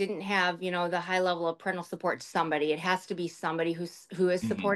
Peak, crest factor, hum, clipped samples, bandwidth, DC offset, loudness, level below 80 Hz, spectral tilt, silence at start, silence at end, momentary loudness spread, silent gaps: -12 dBFS; 18 dB; none; under 0.1%; 12.5 kHz; under 0.1%; -30 LUFS; -74 dBFS; -5 dB/octave; 0 s; 0 s; 6 LU; none